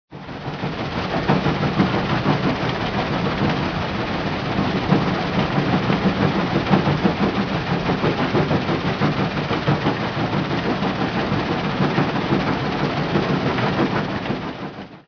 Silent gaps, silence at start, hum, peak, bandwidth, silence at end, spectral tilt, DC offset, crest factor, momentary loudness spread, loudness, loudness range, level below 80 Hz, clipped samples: none; 0.1 s; none; -2 dBFS; 5.4 kHz; 0.05 s; -7 dB/octave; under 0.1%; 18 dB; 5 LU; -21 LUFS; 2 LU; -40 dBFS; under 0.1%